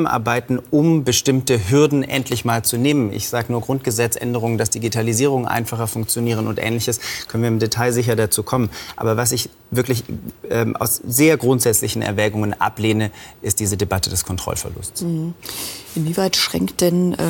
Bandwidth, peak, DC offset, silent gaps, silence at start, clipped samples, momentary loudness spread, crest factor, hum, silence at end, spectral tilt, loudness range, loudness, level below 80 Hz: 17.5 kHz; -4 dBFS; under 0.1%; none; 0 s; under 0.1%; 9 LU; 16 dB; none; 0 s; -4.5 dB/octave; 4 LU; -19 LUFS; -48 dBFS